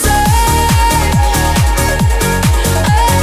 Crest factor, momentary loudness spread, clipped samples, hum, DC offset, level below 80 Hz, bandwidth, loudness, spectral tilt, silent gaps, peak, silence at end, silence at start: 10 dB; 2 LU; under 0.1%; none; under 0.1%; -14 dBFS; 16 kHz; -11 LUFS; -4.5 dB/octave; none; 0 dBFS; 0 s; 0 s